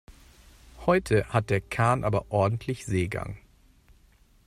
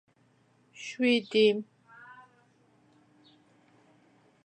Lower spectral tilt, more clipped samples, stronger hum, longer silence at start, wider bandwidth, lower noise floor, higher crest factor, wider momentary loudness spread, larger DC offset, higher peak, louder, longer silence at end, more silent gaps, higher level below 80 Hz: first, -6.5 dB/octave vs -4.5 dB/octave; neither; neither; second, 0.1 s vs 0.8 s; first, 15 kHz vs 9.4 kHz; second, -59 dBFS vs -66 dBFS; about the same, 18 dB vs 20 dB; second, 9 LU vs 27 LU; neither; about the same, -10 dBFS vs -12 dBFS; about the same, -27 LUFS vs -27 LUFS; second, 1.1 s vs 2.8 s; neither; first, -50 dBFS vs -88 dBFS